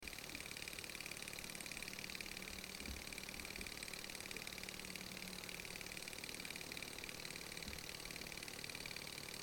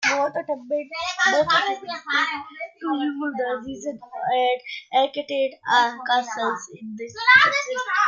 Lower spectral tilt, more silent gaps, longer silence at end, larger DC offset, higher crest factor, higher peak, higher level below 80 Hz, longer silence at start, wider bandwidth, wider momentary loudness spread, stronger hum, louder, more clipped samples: about the same, -2 dB/octave vs -2 dB/octave; neither; about the same, 0 s vs 0 s; neither; about the same, 20 dB vs 20 dB; second, -30 dBFS vs -2 dBFS; about the same, -64 dBFS vs -68 dBFS; about the same, 0 s vs 0 s; first, 17 kHz vs 7.6 kHz; second, 1 LU vs 15 LU; neither; second, -48 LUFS vs -22 LUFS; neither